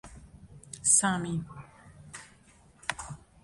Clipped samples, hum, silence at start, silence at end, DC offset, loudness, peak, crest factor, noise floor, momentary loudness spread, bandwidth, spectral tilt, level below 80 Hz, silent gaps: under 0.1%; none; 0.05 s; 0.25 s; under 0.1%; -27 LUFS; -10 dBFS; 24 dB; -59 dBFS; 25 LU; 12 kHz; -2.5 dB/octave; -58 dBFS; none